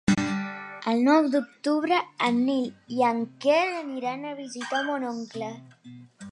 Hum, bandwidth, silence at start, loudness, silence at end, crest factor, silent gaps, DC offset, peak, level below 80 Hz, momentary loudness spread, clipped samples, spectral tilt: none; 11 kHz; 0.05 s; -26 LUFS; 0 s; 18 dB; none; under 0.1%; -8 dBFS; -62 dBFS; 14 LU; under 0.1%; -5.5 dB/octave